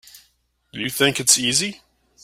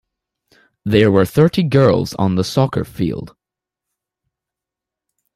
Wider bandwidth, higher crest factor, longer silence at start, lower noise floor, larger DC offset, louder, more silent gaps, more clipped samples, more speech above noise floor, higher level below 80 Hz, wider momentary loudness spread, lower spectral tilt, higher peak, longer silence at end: about the same, 16 kHz vs 15.5 kHz; first, 24 dB vs 16 dB; second, 0.15 s vs 0.85 s; second, -65 dBFS vs -86 dBFS; neither; about the same, -18 LUFS vs -16 LUFS; neither; neither; second, 45 dB vs 71 dB; second, -60 dBFS vs -48 dBFS; first, 14 LU vs 9 LU; second, -1.5 dB/octave vs -7 dB/octave; about the same, 0 dBFS vs -2 dBFS; second, 0.45 s vs 2.05 s